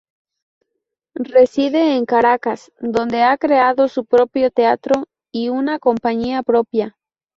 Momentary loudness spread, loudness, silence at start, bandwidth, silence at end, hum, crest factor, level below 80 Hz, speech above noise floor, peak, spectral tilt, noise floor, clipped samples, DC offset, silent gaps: 10 LU; -16 LUFS; 1.2 s; 7.6 kHz; 0.5 s; none; 16 dB; -56 dBFS; 61 dB; -2 dBFS; -5.5 dB/octave; -77 dBFS; under 0.1%; under 0.1%; none